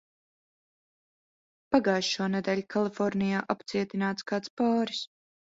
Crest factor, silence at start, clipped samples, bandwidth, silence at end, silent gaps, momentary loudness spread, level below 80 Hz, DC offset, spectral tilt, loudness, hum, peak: 22 dB; 1.7 s; under 0.1%; 7.8 kHz; 0.5 s; 4.50-4.57 s; 6 LU; -70 dBFS; under 0.1%; -5 dB/octave; -29 LUFS; none; -8 dBFS